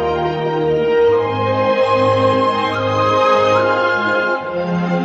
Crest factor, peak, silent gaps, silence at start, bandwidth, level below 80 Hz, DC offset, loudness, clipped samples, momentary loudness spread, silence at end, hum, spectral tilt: 12 dB; -2 dBFS; none; 0 s; 8 kHz; -46 dBFS; under 0.1%; -15 LUFS; under 0.1%; 6 LU; 0 s; none; -6.5 dB/octave